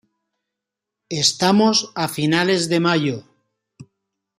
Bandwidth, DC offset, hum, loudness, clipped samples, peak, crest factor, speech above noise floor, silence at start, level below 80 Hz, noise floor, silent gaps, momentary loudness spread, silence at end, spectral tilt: 15 kHz; under 0.1%; none; -18 LUFS; under 0.1%; -2 dBFS; 20 dB; 66 dB; 1.1 s; -64 dBFS; -84 dBFS; none; 10 LU; 0.55 s; -4 dB/octave